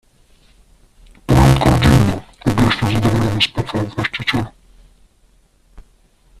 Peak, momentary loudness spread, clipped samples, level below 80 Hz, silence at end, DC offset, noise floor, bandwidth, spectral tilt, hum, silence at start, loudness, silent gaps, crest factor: 0 dBFS; 10 LU; under 0.1%; -28 dBFS; 1.9 s; under 0.1%; -54 dBFS; 14 kHz; -6 dB/octave; none; 1.3 s; -16 LUFS; none; 18 dB